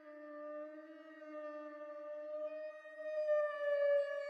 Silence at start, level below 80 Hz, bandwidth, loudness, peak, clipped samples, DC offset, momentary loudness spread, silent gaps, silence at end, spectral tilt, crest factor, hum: 0 s; under -90 dBFS; 6.2 kHz; -40 LUFS; -26 dBFS; under 0.1%; under 0.1%; 17 LU; none; 0 s; -2 dB/octave; 14 dB; none